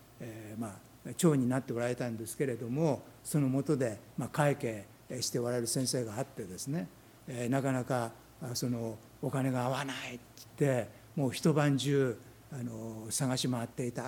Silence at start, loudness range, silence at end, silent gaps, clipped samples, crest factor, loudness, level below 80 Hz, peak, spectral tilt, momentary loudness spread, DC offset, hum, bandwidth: 0 s; 3 LU; 0 s; none; under 0.1%; 20 dB; -34 LUFS; -68 dBFS; -12 dBFS; -5.5 dB/octave; 14 LU; under 0.1%; none; 18.5 kHz